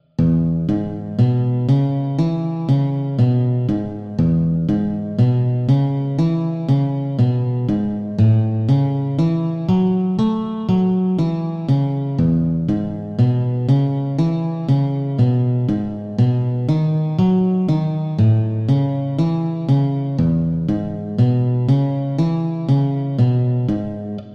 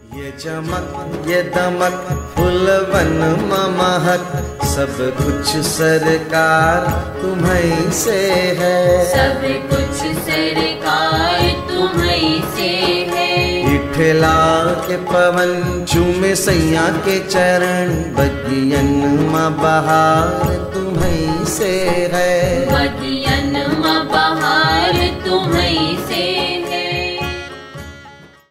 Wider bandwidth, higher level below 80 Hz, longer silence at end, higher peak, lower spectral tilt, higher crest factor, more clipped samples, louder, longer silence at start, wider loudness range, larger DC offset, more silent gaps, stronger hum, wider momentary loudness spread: second, 6 kHz vs 16 kHz; second, -44 dBFS vs -32 dBFS; second, 0 s vs 0.25 s; about the same, -4 dBFS vs -2 dBFS; first, -10.5 dB/octave vs -4.5 dB/octave; about the same, 12 dB vs 14 dB; neither; second, -18 LUFS vs -15 LUFS; about the same, 0.2 s vs 0.1 s; about the same, 1 LU vs 2 LU; neither; neither; neither; about the same, 5 LU vs 7 LU